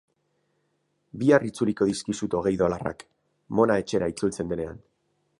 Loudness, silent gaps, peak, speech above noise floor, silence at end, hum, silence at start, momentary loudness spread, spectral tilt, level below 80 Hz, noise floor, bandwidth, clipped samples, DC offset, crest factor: -25 LUFS; none; -4 dBFS; 48 dB; 0.65 s; none; 1.15 s; 12 LU; -6 dB/octave; -54 dBFS; -73 dBFS; 11.5 kHz; under 0.1%; under 0.1%; 22 dB